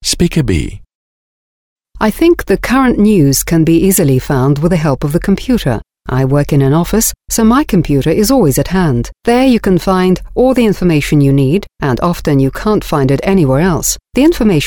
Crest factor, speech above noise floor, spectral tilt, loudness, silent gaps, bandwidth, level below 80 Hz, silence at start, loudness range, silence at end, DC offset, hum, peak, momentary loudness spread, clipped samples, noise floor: 12 dB; over 79 dB; -5.5 dB/octave; -11 LUFS; 0.95-1.76 s; over 20 kHz; -28 dBFS; 0 s; 2 LU; 0 s; under 0.1%; none; 0 dBFS; 5 LU; under 0.1%; under -90 dBFS